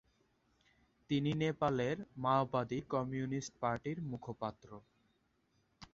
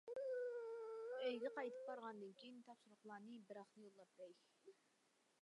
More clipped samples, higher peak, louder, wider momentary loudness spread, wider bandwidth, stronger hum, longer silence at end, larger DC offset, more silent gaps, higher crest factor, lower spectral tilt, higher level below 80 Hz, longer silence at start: neither; first, -18 dBFS vs -34 dBFS; first, -37 LUFS vs -51 LUFS; second, 10 LU vs 17 LU; second, 7.6 kHz vs 11 kHz; neither; second, 0.05 s vs 0.7 s; neither; neither; about the same, 20 dB vs 18 dB; about the same, -6 dB/octave vs -5 dB/octave; first, -68 dBFS vs under -90 dBFS; first, 1.1 s vs 0.05 s